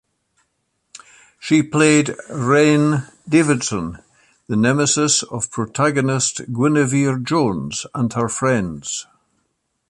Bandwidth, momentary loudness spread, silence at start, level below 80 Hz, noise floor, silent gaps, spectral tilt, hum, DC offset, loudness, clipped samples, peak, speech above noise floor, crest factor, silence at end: 11.5 kHz; 10 LU; 0.95 s; -52 dBFS; -71 dBFS; none; -4.5 dB/octave; none; under 0.1%; -18 LUFS; under 0.1%; -2 dBFS; 53 dB; 16 dB; 0.85 s